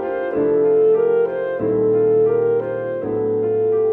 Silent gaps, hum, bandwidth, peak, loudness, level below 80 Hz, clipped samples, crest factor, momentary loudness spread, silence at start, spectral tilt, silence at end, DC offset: none; none; 3.3 kHz; -8 dBFS; -18 LUFS; -56 dBFS; under 0.1%; 8 dB; 7 LU; 0 s; -11 dB/octave; 0 s; under 0.1%